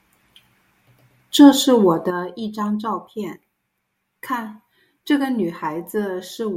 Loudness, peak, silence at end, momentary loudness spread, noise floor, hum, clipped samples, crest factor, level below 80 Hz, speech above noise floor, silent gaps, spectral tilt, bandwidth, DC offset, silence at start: -19 LUFS; 0 dBFS; 0 s; 19 LU; -74 dBFS; none; under 0.1%; 20 dB; -68 dBFS; 56 dB; none; -4.5 dB/octave; 16 kHz; under 0.1%; 1.35 s